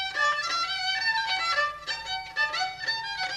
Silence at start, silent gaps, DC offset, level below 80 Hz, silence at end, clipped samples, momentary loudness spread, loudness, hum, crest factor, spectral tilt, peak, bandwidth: 0 s; none; under 0.1%; -60 dBFS; 0 s; under 0.1%; 6 LU; -27 LUFS; none; 14 dB; 0.5 dB/octave; -14 dBFS; 14 kHz